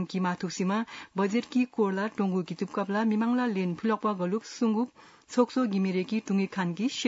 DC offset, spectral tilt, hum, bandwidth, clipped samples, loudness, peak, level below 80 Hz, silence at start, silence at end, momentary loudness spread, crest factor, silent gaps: under 0.1%; -6 dB/octave; none; 8 kHz; under 0.1%; -29 LUFS; -12 dBFS; -78 dBFS; 0 s; 0 s; 5 LU; 16 dB; none